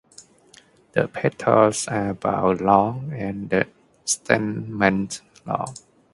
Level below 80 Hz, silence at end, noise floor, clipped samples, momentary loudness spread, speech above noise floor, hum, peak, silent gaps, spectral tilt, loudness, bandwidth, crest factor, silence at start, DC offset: -54 dBFS; 0.4 s; -53 dBFS; under 0.1%; 12 LU; 32 dB; none; 0 dBFS; none; -5 dB/octave; -22 LUFS; 11.5 kHz; 22 dB; 0.2 s; under 0.1%